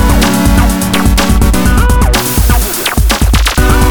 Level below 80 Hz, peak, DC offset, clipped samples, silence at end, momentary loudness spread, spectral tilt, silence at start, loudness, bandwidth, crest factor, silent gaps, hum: -10 dBFS; 0 dBFS; under 0.1%; under 0.1%; 0 s; 2 LU; -4.5 dB/octave; 0 s; -10 LUFS; over 20 kHz; 8 dB; none; none